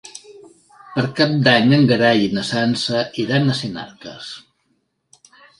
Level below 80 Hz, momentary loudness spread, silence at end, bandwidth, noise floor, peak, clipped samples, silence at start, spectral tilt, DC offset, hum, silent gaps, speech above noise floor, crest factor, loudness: -58 dBFS; 20 LU; 1.2 s; 11.5 kHz; -67 dBFS; 0 dBFS; under 0.1%; 0.05 s; -6 dB/octave; under 0.1%; none; none; 50 dB; 20 dB; -17 LUFS